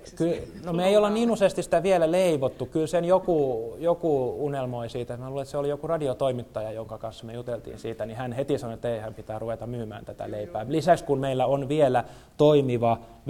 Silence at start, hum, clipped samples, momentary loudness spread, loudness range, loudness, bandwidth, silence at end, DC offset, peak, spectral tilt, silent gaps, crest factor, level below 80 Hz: 0 s; none; under 0.1%; 13 LU; 9 LU; -26 LUFS; 16 kHz; 0 s; under 0.1%; -8 dBFS; -6.5 dB/octave; none; 18 dB; -54 dBFS